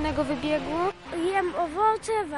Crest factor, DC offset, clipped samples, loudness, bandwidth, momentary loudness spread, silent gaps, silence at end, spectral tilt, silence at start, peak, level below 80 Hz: 16 dB; under 0.1%; under 0.1%; -27 LUFS; 11.5 kHz; 5 LU; none; 0 s; -5 dB/octave; 0 s; -12 dBFS; -48 dBFS